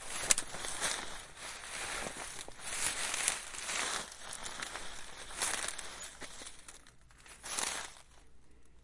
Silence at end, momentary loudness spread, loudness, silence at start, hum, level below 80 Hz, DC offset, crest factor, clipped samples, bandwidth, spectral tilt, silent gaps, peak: 0 s; 16 LU; -37 LUFS; 0 s; none; -58 dBFS; under 0.1%; 36 dB; under 0.1%; 11.5 kHz; 0.5 dB/octave; none; -4 dBFS